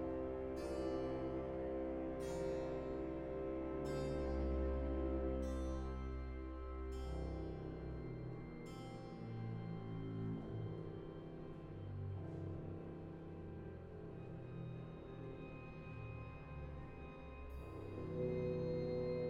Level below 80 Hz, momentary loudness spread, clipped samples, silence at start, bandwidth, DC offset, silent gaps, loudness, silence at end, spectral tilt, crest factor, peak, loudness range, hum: -52 dBFS; 11 LU; under 0.1%; 0 s; 11 kHz; under 0.1%; none; -46 LUFS; 0 s; -8 dB/octave; 16 dB; -30 dBFS; 9 LU; none